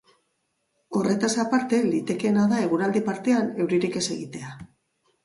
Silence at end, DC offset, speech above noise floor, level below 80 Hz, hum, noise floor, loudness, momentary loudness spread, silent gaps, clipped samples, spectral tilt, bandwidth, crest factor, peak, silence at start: 0.6 s; under 0.1%; 51 dB; -66 dBFS; none; -74 dBFS; -24 LUFS; 12 LU; none; under 0.1%; -5 dB/octave; 11.5 kHz; 16 dB; -10 dBFS; 0.9 s